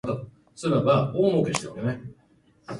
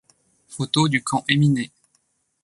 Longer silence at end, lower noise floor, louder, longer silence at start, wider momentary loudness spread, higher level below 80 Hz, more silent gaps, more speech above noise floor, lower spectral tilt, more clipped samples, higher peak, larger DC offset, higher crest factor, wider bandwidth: second, 0 s vs 0.8 s; second, -60 dBFS vs -68 dBFS; second, -25 LUFS vs -21 LUFS; second, 0.05 s vs 0.5 s; about the same, 16 LU vs 14 LU; about the same, -58 dBFS vs -60 dBFS; neither; second, 36 dB vs 48 dB; first, -6.5 dB/octave vs -5 dB/octave; neither; second, -6 dBFS vs -2 dBFS; neither; about the same, 20 dB vs 22 dB; about the same, 11.5 kHz vs 11.5 kHz